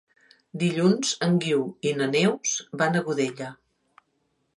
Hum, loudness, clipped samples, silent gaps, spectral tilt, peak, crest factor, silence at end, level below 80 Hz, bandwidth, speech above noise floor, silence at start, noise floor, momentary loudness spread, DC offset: none; -24 LUFS; under 0.1%; none; -4.5 dB/octave; -8 dBFS; 18 dB; 1.05 s; -72 dBFS; 11.5 kHz; 48 dB; 0.55 s; -72 dBFS; 7 LU; under 0.1%